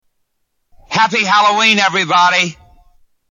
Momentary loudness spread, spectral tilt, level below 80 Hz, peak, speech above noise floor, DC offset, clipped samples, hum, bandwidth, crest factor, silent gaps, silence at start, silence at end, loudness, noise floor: 6 LU; -2.5 dB/octave; -54 dBFS; 0 dBFS; 55 dB; under 0.1%; under 0.1%; none; 11.5 kHz; 14 dB; none; 0.9 s; 0.75 s; -12 LUFS; -67 dBFS